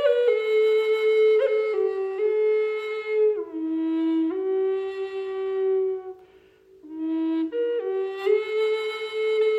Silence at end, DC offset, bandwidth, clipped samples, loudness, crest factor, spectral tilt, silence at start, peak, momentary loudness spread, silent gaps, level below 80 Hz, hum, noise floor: 0 s; under 0.1%; 7.8 kHz; under 0.1%; -24 LUFS; 14 dB; -4 dB/octave; 0 s; -10 dBFS; 9 LU; none; -74 dBFS; none; -54 dBFS